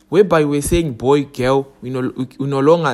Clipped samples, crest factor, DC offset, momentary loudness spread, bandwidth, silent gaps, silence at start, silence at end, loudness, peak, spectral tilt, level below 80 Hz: under 0.1%; 16 dB; under 0.1%; 10 LU; 13 kHz; none; 0.1 s; 0 s; -17 LUFS; 0 dBFS; -6 dB/octave; -36 dBFS